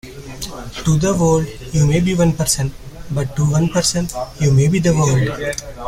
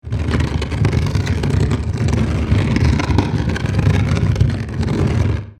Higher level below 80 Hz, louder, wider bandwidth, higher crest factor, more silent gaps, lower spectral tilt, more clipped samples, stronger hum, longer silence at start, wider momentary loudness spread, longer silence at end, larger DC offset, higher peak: second, -34 dBFS vs -26 dBFS; about the same, -17 LUFS vs -18 LUFS; first, 16 kHz vs 11 kHz; about the same, 14 dB vs 16 dB; neither; second, -5.5 dB/octave vs -7 dB/octave; neither; neither; about the same, 0.05 s vs 0.05 s; first, 12 LU vs 3 LU; about the same, 0 s vs 0.05 s; neither; about the same, -2 dBFS vs 0 dBFS